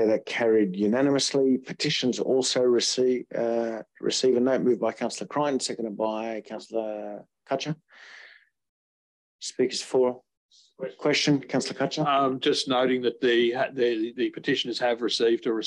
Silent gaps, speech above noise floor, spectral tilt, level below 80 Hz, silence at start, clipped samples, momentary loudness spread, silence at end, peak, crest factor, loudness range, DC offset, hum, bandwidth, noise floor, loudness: 8.69-9.39 s, 10.37-10.49 s; over 65 dB; -4 dB/octave; -76 dBFS; 0 s; under 0.1%; 10 LU; 0 s; -12 dBFS; 14 dB; 9 LU; under 0.1%; none; 11 kHz; under -90 dBFS; -25 LUFS